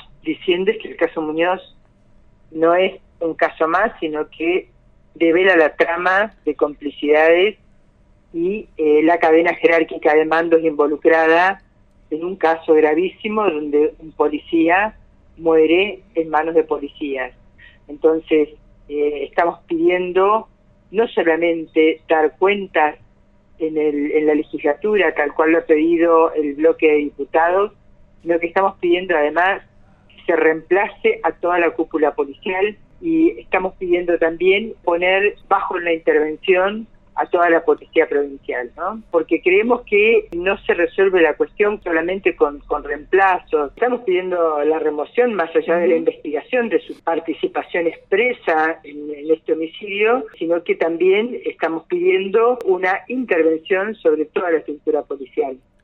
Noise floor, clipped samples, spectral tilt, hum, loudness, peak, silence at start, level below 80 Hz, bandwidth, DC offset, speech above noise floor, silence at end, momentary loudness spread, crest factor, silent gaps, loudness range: -52 dBFS; under 0.1%; -7 dB/octave; none; -18 LUFS; 0 dBFS; 0.25 s; -52 dBFS; 4.7 kHz; under 0.1%; 35 dB; 0.3 s; 10 LU; 18 dB; none; 4 LU